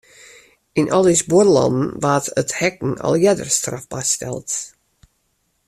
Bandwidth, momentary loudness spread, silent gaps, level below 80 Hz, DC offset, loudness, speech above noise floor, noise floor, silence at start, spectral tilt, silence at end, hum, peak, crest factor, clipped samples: 14 kHz; 11 LU; none; -54 dBFS; under 0.1%; -18 LUFS; 50 dB; -67 dBFS; 0.75 s; -4.5 dB/octave; 1 s; none; -2 dBFS; 16 dB; under 0.1%